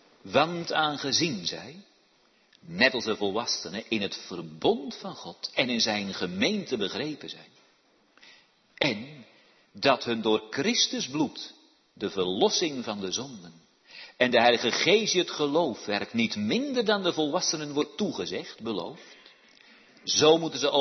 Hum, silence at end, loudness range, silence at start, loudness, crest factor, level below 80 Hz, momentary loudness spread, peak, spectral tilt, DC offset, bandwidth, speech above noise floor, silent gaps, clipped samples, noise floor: none; 0 s; 6 LU; 0.25 s; -27 LUFS; 22 dB; -72 dBFS; 16 LU; -6 dBFS; -3 dB/octave; under 0.1%; 6.4 kHz; 37 dB; none; under 0.1%; -65 dBFS